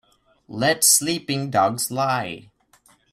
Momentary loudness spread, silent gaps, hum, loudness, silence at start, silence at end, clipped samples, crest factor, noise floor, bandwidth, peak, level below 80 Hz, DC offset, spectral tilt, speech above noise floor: 17 LU; none; none; -19 LUFS; 0.5 s; 0.7 s; under 0.1%; 20 dB; -58 dBFS; 16 kHz; -4 dBFS; -62 dBFS; under 0.1%; -2.5 dB/octave; 37 dB